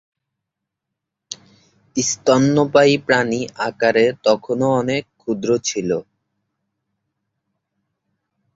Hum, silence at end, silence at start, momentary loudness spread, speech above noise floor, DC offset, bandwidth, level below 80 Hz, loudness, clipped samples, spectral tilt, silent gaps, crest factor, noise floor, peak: none; 2.55 s; 1.3 s; 12 LU; 64 dB; under 0.1%; 8 kHz; -58 dBFS; -18 LUFS; under 0.1%; -4.5 dB/octave; none; 20 dB; -81 dBFS; 0 dBFS